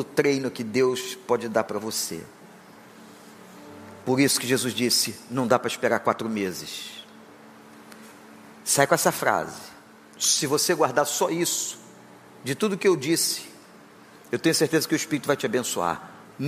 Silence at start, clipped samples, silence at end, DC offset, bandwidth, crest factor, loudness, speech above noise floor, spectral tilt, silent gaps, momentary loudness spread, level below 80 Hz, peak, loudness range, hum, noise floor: 0 s; under 0.1%; 0 s; under 0.1%; 15.5 kHz; 22 dB; -24 LUFS; 25 dB; -3 dB/octave; none; 18 LU; -72 dBFS; -4 dBFS; 5 LU; none; -49 dBFS